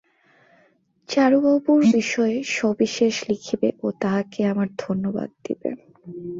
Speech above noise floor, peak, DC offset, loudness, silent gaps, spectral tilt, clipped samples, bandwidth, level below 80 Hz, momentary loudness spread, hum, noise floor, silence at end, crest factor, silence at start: 40 dB; -6 dBFS; under 0.1%; -22 LUFS; none; -5.5 dB/octave; under 0.1%; 7.8 kHz; -64 dBFS; 13 LU; none; -61 dBFS; 0 s; 16 dB; 1.1 s